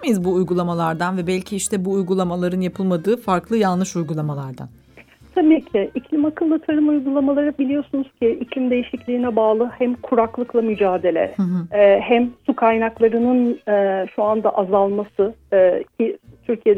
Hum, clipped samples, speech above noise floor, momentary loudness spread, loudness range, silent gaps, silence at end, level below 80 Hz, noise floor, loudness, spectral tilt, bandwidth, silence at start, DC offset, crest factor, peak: none; under 0.1%; 29 dB; 7 LU; 3 LU; none; 0 s; -54 dBFS; -47 dBFS; -19 LUFS; -6.5 dB/octave; 15 kHz; 0 s; under 0.1%; 16 dB; -4 dBFS